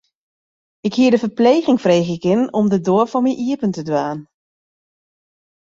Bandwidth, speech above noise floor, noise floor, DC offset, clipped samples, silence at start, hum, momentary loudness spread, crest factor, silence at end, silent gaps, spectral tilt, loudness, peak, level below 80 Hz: 7.6 kHz; over 74 dB; under -90 dBFS; under 0.1%; under 0.1%; 0.85 s; none; 7 LU; 16 dB; 1.45 s; none; -6.5 dB/octave; -17 LUFS; -2 dBFS; -60 dBFS